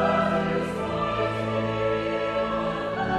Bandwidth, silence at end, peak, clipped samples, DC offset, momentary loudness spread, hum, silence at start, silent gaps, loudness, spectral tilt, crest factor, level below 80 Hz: 12 kHz; 0 s; -12 dBFS; under 0.1%; under 0.1%; 4 LU; none; 0 s; none; -26 LUFS; -6.5 dB/octave; 14 dB; -48 dBFS